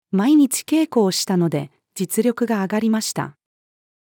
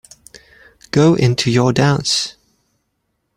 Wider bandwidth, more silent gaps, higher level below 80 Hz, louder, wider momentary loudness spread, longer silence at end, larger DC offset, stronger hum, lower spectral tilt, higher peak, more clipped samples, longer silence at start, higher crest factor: first, 19.5 kHz vs 15 kHz; neither; second, -74 dBFS vs -48 dBFS; second, -19 LUFS vs -15 LUFS; first, 12 LU vs 6 LU; second, 0.85 s vs 1.05 s; neither; neither; about the same, -5 dB/octave vs -5 dB/octave; second, -6 dBFS vs -2 dBFS; neither; second, 0.15 s vs 0.95 s; about the same, 14 dB vs 16 dB